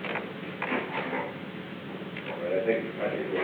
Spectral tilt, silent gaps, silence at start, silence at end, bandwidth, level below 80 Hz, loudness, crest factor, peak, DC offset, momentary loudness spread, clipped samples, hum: -7.5 dB/octave; none; 0 s; 0 s; 20 kHz; -74 dBFS; -32 LUFS; 18 dB; -14 dBFS; under 0.1%; 10 LU; under 0.1%; none